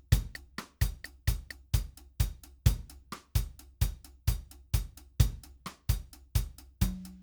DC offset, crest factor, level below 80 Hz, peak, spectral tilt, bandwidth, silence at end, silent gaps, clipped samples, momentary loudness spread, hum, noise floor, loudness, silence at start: under 0.1%; 24 dB; -36 dBFS; -10 dBFS; -5 dB/octave; over 20 kHz; 0 s; none; under 0.1%; 14 LU; none; -48 dBFS; -35 LUFS; 0.1 s